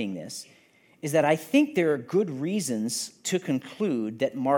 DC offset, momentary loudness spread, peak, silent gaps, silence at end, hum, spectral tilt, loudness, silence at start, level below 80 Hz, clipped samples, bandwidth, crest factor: under 0.1%; 11 LU; -8 dBFS; none; 0 s; none; -5 dB/octave; -27 LUFS; 0 s; -78 dBFS; under 0.1%; 17.5 kHz; 18 dB